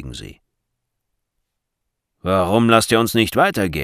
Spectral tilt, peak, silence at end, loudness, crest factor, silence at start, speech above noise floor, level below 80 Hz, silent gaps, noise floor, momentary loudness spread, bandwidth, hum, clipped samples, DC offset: -5 dB/octave; 0 dBFS; 0 s; -16 LUFS; 20 dB; 0 s; 61 dB; -46 dBFS; none; -78 dBFS; 16 LU; 16 kHz; none; under 0.1%; under 0.1%